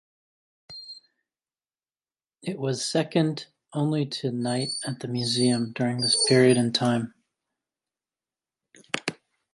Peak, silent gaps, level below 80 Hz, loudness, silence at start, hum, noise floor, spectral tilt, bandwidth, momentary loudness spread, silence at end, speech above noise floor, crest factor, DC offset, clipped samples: -6 dBFS; none; -68 dBFS; -25 LUFS; 0.7 s; none; under -90 dBFS; -4.5 dB/octave; 11.5 kHz; 19 LU; 0.4 s; over 66 dB; 22 dB; under 0.1%; under 0.1%